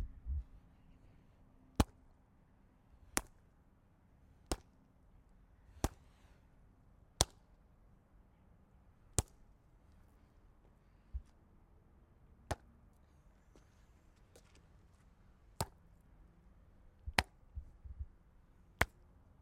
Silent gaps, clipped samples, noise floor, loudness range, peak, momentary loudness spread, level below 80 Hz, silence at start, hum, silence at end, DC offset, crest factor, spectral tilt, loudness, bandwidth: none; under 0.1%; -68 dBFS; 12 LU; -6 dBFS; 29 LU; -54 dBFS; 0 s; none; 0.55 s; under 0.1%; 40 dB; -3 dB/octave; -42 LUFS; 15.5 kHz